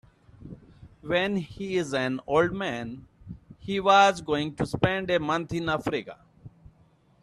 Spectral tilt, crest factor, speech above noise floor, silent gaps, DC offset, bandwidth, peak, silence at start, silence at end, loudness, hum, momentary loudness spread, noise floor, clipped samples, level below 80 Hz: -5.5 dB/octave; 22 dB; 35 dB; none; under 0.1%; 12.5 kHz; -6 dBFS; 0.4 s; 0.75 s; -26 LUFS; none; 25 LU; -61 dBFS; under 0.1%; -54 dBFS